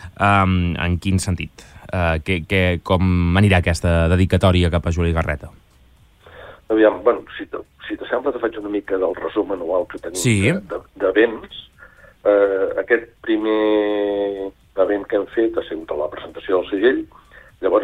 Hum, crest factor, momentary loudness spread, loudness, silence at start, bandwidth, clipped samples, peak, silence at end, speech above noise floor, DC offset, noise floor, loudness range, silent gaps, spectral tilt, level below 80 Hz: none; 16 dB; 12 LU; -19 LUFS; 0 s; 14.5 kHz; under 0.1%; -2 dBFS; 0 s; 33 dB; under 0.1%; -51 dBFS; 5 LU; none; -6 dB/octave; -36 dBFS